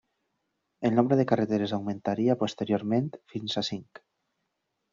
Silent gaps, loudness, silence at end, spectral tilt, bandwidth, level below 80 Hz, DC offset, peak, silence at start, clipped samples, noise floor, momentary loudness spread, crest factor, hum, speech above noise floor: none; -28 LUFS; 1.1 s; -5.5 dB/octave; 7.4 kHz; -68 dBFS; under 0.1%; -6 dBFS; 0.8 s; under 0.1%; -80 dBFS; 10 LU; 22 dB; none; 53 dB